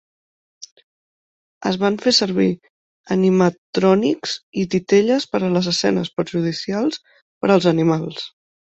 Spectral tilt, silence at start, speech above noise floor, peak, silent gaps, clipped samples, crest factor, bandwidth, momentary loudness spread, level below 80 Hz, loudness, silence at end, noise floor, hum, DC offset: -5.5 dB/octave; 0.6 s; over 72 dB; -2 dBFS; 0.72-0.76 s, 0.83-1.61 s, 2.70-3.04 s, 3.58-3.73 s, 4.43-4.52 s, 7.22-7.41 s; under 0.1%; 18 dB; 8.2 kHz; 9 LU; -60 dBFS; -19 LUFS; 0.45 s; under -90 dBFS; none; under 0.1%